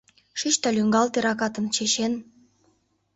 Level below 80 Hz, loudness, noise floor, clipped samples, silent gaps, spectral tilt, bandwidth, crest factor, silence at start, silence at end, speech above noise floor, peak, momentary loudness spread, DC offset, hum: -66 dBFS; -23 LUFS; -67 dBFS; under 0.1%; none; -3 dB/octave; 8.2 kHz; 18 dB; 0.35 s; 0.95 s; 43 dB; -8 dBFS; 8 LU; under 0.1%; none